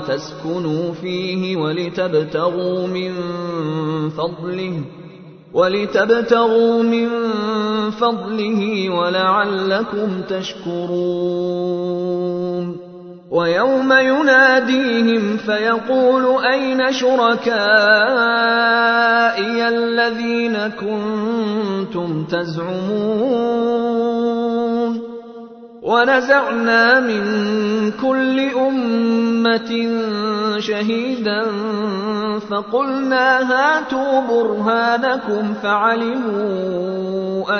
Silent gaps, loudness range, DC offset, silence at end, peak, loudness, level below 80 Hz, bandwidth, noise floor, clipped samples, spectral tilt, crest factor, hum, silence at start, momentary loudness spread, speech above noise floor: none; 7 LU; under 0.1%; 0 s; 0 dBFS; -17 LUFS; -60 dBFS; 6.6 kHz; -39 dBFS; under 0.1%; -6 dB/octave; 16 dB; none; 0 s; 10 LU; 22 dB